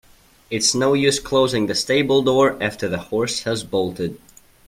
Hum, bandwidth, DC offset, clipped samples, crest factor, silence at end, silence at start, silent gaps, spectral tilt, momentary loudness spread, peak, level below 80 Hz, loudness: none; 16 kHz; under 0.1%; under 0.1%; 18 dB; 0.5 s; 0.5 s; none; -3.5 dB/octave; 9 LU; -2 dBFS; -50 dBFS; -19 LUFS